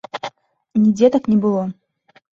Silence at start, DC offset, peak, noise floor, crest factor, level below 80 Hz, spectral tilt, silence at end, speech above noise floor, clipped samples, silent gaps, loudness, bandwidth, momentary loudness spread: 0.15 s; under 0.1%; -2 dBFS; -38 dBFS; 16 dB; -58 dBFS; -7.5 dB/octave; 0.6 s; 23 dB; under 0.1%; none; -17 LUFS; 7.4 kHz; 16 LU